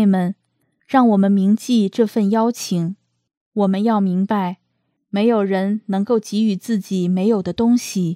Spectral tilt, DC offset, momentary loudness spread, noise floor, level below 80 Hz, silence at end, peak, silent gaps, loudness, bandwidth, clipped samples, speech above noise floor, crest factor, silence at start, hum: -7 dB/octave; under 0.1%; 10 LU; -70 dBFS; -62 dBFS; 0 s; -2 dBFS; 3.37-3.52 s; -18 LUFS; 14.5 kHz; under 0.1%; 53 dB; 16 dB; 0 s; none